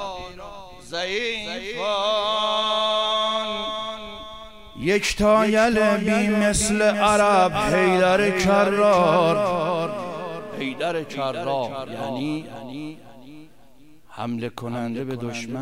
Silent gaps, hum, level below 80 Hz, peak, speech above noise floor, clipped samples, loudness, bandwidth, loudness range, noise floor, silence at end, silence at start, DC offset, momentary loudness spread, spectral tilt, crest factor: none; none; -46 dBFS; -6 dBFS; 32 dB; under 0.1%; -21 LUFS; 16 kHz; 12 LU; -53 dBFS; 0 s; 0 s; 0.4%; 17 LU; -4 dB/octave; 16 dB